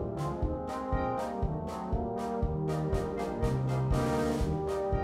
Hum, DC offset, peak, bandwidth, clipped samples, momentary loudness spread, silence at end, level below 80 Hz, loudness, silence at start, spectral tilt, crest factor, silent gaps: none; under 0.1%; -18 dBFS; 14.5 kHz; under 0.1%; 5 LU; 0 s; -38 dBFS; -33 LUFS; 0 s; -7.5 dB/octave; 14 dB; none